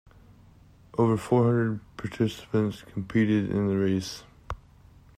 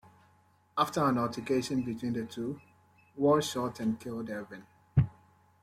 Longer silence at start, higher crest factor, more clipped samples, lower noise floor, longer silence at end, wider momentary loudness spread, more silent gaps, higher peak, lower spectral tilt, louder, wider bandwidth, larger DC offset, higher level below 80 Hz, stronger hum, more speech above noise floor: first, 0.95 s vs 0.75 s; about the same, 18 dB vs 20 dB; neither; second, -54 dBFS vs -66 dBFS; about the same, 0.6 s vs 0.5 s; first, 18 LU vs 13 LU; neither; about the same, -10 dBFS vs -12 dBFS; about the same, -7.5 dB/octave vs -6.5 dB/octave; first, -26 LUFS vs -32 LUFS; second, 14.5 kHz vs 16 kHz; neither; about the same, -52 dBFS vs -54 dBFS; neither; second, 29 dB vs 35 dB